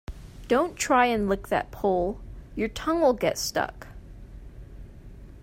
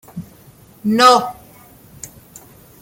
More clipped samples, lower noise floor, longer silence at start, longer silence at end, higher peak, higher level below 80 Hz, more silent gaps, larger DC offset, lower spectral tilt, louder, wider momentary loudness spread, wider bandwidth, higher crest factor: neither; about the same, -44 dBFS vs -45 dBFS; about the same, 0.1 s vs 0.15 s; second, 0 s vs 0.75 s; second, -8 dBFS vs 0 dBFS; first, -44 dBFS vs -56 dBFS; neither; neither; about the same, -4 dB/octave vs -3.5 dB/octave; second, -25 LUFS vs -13 LUFS; about the same, 25 LU vs 25 LU; about the same, 16 kHz vs 17 kHz; about the same, 20 dB vs 18 dB